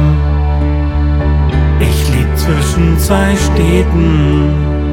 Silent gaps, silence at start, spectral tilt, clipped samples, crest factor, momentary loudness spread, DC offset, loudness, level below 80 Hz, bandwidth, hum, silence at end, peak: none; 0 s; -6.5 dB/octave; under 0.1%; 10 dB; 3 LU; under 0.1%; -12 LUFS; -14 dBFS; 16.5 kHz; none; 0 s; 0 dBFS